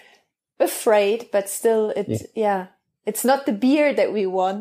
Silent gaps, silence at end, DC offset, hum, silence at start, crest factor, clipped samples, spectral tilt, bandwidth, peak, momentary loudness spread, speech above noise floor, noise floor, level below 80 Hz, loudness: none; 0 s; under 0.1%; none; 0.6 s; 16 dB; under 0.1%; -4.5 dB/octave; 15.5 kHz; -6 dBFS; 9 LU; 40 dB; -61 dBFS; -68 dBFS; -21 LUFS